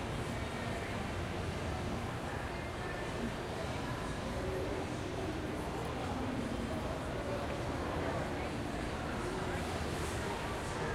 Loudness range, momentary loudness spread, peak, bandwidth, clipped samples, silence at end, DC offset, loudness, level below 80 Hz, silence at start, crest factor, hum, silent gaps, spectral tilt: 1 LU; 2 LU; -24 dBFS; 16 kHz; under 0.1%; 0 s; under 0.1%; -39 LUFS; -48 dBFS; 0 s; 14 dB; none; none; -5.5 dB/octave